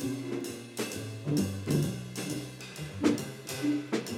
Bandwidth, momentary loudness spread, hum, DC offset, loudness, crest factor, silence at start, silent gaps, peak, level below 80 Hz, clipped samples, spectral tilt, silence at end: 17 kHz; 9 LU; none; under 0.1%; -33 LUFS; 20 dB; 0 s; none; -12 dBFS; -62 dBFS; under 0.1%; -5.5 dB/octave; 0 s